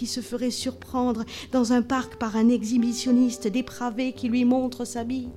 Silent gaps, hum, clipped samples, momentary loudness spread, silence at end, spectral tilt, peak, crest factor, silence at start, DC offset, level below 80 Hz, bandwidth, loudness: none; none; under 0.1%; 8 LU; 0 s; -4.5 dB/octave; -12 dBFS; 14 dB; 0 s; under 0.1%; -54 dBFS; 13.5 kHz; -25 LUFS